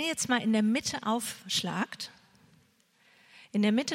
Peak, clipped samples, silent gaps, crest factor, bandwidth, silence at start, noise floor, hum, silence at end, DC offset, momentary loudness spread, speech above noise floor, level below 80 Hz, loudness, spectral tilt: -14 dBFS; under 0.1%; none; 18 dB; 16.5 kHz; 0 s; -66 dBFS; none; 0 s; under 0.1%; 9 LU; 37 dB; -72 dBFS; -30 LUFS; -3.5 dB/octave